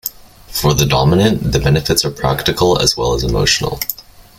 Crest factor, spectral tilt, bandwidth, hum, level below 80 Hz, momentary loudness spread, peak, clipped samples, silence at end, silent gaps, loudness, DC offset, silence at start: 14 dB; -4.5 dB/octave; 17 kHz; none; -30 dBFS; 10 LU; 0 dBFS; under 0.1%; 0.4 s; none; -14 LUFS; under 0.1%; 0.05 s